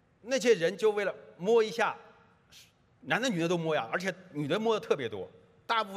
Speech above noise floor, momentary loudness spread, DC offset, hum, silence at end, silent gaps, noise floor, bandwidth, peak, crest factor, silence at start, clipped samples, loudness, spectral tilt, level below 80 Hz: 30 dB; 11 LU; under 0.1%; none; 0 s; none; -59 dBFS; 14 kHz; -12 dBFS; 18 dB; 0.25 s; under 0.1%; -30 LUFS; -4.5 dB/octave; -78 dBFS